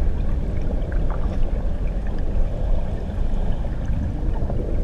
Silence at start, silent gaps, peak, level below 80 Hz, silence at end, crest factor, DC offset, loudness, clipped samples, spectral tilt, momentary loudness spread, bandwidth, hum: 0 s; none; -8 dBFS; -22 dBFS; 0 s; 12 dB; under 0.1%; -27 LUFS; under 0.1%; -9 dB/octave; 2 LU; 3.9 kHz; none